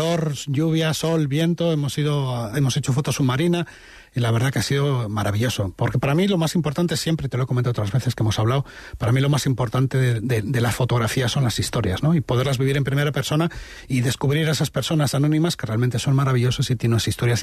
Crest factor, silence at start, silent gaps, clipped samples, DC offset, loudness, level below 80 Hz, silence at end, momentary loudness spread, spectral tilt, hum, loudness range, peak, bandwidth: 10 dB; 0 s; none; under 0.1%; under 0.1%; -21 LUFS; -46 dBFS; 0 s; 4 LU; -5.5 dB/octave; none; 1 LU; -10 dBFS; 13.5 kHz